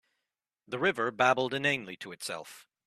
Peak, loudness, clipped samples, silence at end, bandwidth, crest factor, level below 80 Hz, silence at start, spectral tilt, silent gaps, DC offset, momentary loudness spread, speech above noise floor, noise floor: -10 dBFS; -29 LUFS; under 0.1%; 0.25 s; 14 kHz; 22 dB; -74 dBFS; 0.7 s; -4 dB/octave; none; under 0.1%; 15 LU; 56 dB; -87 dBFS